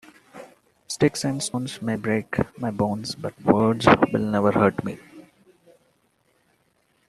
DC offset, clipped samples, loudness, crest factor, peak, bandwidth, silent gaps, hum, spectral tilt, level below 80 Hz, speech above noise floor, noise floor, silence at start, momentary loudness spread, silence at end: under 0.1%; under 0.1%; -23 LUFS; 24 dB; -2 dBFS; 13 kHz; none; none; -5.5 dB/octave; -54 dBFS; 44 dB; -66 dBFS; 0.35 s; 13 LU; 1.9 s